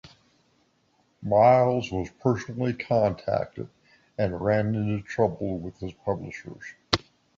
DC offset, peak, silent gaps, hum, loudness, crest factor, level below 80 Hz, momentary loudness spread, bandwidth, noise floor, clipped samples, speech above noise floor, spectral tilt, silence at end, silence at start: under 0.1%; -2 dBFS; none; none; -26 LUFS; 24 dB; -52 dBFS; 19 LU; 7.8 kHz; -67 dBFS; under 0.1%; 42 dB; -6.5 dB/octave; 0.4 s; 0.05 s